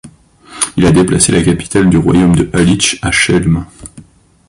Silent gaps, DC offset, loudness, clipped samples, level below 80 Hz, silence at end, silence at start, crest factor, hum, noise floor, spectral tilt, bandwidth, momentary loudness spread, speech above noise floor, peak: none; under 0.1%; -10 LUFS; under 0.1%; -30 dBFS; 0.5 s; 0.05 s; 12 dB; none; -39 dBFS; -4.5 dB/octave; 11.5 kHz; 7 LU; 29 dB; 0 dBFS